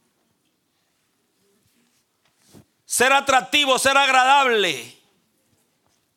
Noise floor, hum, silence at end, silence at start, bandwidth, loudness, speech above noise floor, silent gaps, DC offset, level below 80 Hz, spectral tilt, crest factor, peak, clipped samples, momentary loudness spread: -69 dBFS; none; 1.3 s; 2.9 s; 17 kHz; -17 LUFS; 51 dB; none; under 0.1%; -64 dBFS; -0.5 dB/octave; 20 dB; -2 dBFS; under 0.1%; 10 LU